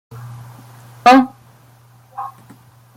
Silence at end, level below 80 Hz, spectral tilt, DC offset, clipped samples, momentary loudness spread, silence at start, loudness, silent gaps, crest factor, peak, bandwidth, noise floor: 0.65 s; -60 dBFS; -5 dB/octave; under 0.1%; under 0.1%; 25 LU; 0.25 s; -13 LUFS; none; 18 dB; 0 dBFS; 15.5 kHz; -48 dBFS